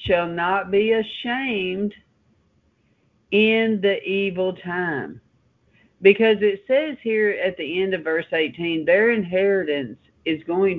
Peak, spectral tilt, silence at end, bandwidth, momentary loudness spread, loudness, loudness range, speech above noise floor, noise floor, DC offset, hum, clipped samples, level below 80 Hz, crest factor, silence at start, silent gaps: 0 dBFS; -8 dB/octave; 0 s; 4.6 kHz; 9 LU; -21 LUFS; 3 LU; 43 dB; -63 dBFS; under 0.1%; none; under 0.1%; -56 dBFS; 20 dB; 0 s; none